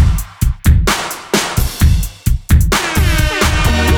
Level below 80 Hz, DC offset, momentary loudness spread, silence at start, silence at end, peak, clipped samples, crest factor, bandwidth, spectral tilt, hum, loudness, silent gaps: -16 dBFS; under 0.1%; 6 LU; 0 s; 0 s; -2 dBFS; under 0.1%; 12 dB; 20 kHz; -4.5 dB/octave; none; -14 LUFS; none